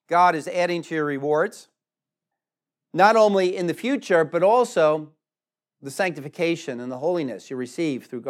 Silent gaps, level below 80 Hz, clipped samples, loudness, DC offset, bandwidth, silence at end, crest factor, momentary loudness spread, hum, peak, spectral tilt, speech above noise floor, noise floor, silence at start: none; under -90 dBFS; under 0.1%; -22 LUFS; under 0.1%; 14.5 kHz; 0 s; 20 dB; 13 LU; none; -4 dBFS; -5.5 dB/octave; over 68 dB; under -90 dBFS; 0.1 s